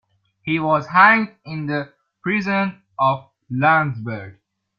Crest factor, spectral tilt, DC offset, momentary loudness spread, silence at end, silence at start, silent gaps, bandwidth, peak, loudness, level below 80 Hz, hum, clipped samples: 20 dB; -7.5 dB/octave; under 0.1%; 17 LU; 0.45 s; 0.45 s; none; 7 kHz; 0 dBFS; -19 LUFS; -62 dBFS; none; under 0.1%